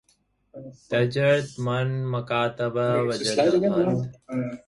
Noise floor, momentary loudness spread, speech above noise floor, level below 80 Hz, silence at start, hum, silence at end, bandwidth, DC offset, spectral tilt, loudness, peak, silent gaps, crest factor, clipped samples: -67 dBFS; 10 LU; 43 dB; -60 dBFS; 0.55 s; none; 0.1 s; 11.5 kHz; under 0.1%; -6 dB/octave; -24 LUFS; -8 dBFS; none; 16 dB; under 0.1%